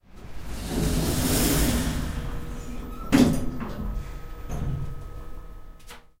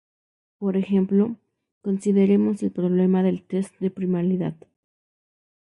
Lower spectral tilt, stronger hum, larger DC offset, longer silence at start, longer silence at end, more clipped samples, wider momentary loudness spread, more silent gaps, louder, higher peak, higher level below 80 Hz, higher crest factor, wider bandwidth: second, -5 dB/octave vs -9 dB/octave; neither; neither; second, 0.1 s vs 0.6 s; second, 0.2 s vs 1.1 s; neither; first, 23 LU vs 9 LU; second, none vs 1.72-1.81 s; second, -27 LUFS vs -23 LUFS; about the same, -6 dBFS vs -8 dBFS; first, -32 dBFS vs -68 dBFS; first, 22 dB vs 14 dB; first, 16 kHz vs 10.5 kHz